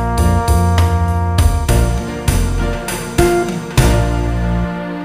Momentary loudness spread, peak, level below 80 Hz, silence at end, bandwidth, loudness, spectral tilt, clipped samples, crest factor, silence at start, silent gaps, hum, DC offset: 6 LU; 0 dBFS; -18 dBFS; 0 s; 15.5 kHz; -16 LUFS; -6 dB/octave; under 0.1%; 14 dB; 0 s; none; none; 0.2%